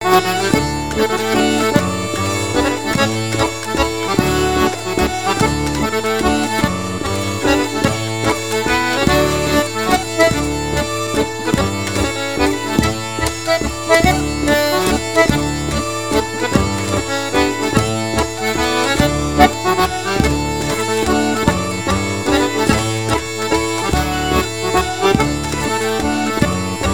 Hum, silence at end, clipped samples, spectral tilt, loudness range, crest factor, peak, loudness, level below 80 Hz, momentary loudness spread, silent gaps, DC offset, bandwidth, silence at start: none; 0 s; under 0.1%; -4.5 dB/octave; 2 LU; 16 dB; 0 dBFS; -16 LUFS; -30 dBFS; 5 LU; none; 1%; 19.5 kHz; 0 s